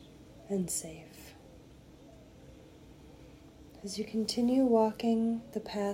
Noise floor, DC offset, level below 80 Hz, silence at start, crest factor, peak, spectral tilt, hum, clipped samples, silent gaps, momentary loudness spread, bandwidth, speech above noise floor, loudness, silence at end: -55 dBFS; under 0.1%; -62 dBFS; 0 s; 20 dB; -14 dBFS; -5 dB/octave; none; under 0.1%; none; 27 LU; 16 kHz; 24 dB; -31 LUFS; 0 s